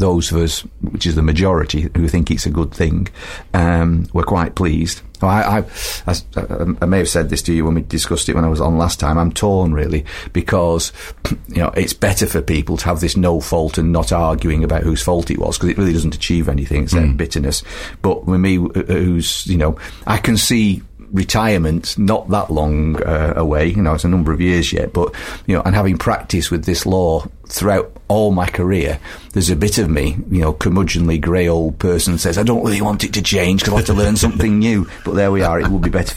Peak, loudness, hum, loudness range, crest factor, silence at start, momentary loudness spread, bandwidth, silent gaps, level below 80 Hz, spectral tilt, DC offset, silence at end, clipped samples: 0 dBFS; -16 LUFS; none; 2 LU; 14 dB; 0 s; 6 LU; 16 kHz; none; -24 dBFS; -5.5 dB/octave; under 0.1%; 0 s; under 0.1%